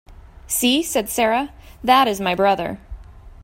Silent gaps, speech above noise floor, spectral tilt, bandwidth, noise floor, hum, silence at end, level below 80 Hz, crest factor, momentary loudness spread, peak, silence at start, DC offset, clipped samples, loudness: none; 20 dB; -3 dB/octave; 16.5 kHz; -39 dBFS; none; 0.1 s; -42 dBFS; 18 dB; 13 LU; -2 dBFS; 0.1 s; under 0.1%; under 0.1%; -19 LUFS